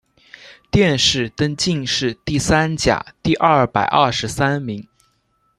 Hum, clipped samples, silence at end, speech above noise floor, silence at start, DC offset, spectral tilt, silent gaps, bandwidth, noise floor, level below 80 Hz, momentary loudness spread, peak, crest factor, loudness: none; under 0.1%; 0.75 s; 46 dB; 0.45 s; under 0.1%; -4.5 dB/octave; none; 13 kHz; -64 dBFS; -40 dBFS; 7 LU; 0 dBFS; 18 dB; -17 LUFS